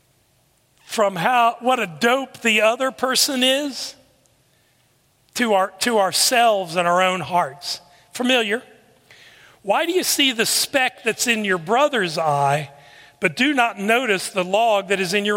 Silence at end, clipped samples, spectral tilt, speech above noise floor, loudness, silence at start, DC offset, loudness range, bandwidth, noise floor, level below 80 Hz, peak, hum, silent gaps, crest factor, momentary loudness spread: 0 s; under 0.1%; -2.5 dB/octave; 42 dB; -19 LUFS; 0.9 s; under 0.1%; 3 LU; 16.5 kHz; -61 dBFS; -68 dBFS; -2 dBFS; none; none; 18 dB; 9 LU